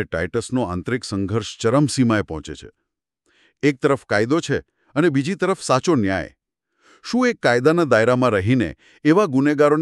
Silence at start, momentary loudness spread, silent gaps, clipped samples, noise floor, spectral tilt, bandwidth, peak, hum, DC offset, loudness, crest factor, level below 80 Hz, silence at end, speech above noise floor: 0 s; 10 LU; none; under 0.1%; -69 dBFS; -6 dB/octave; 12 kHz; -4 dBFS; none; under 0.1%; -20 LUFS; 16 dB; -50 dBFS; 0 s; 50 dB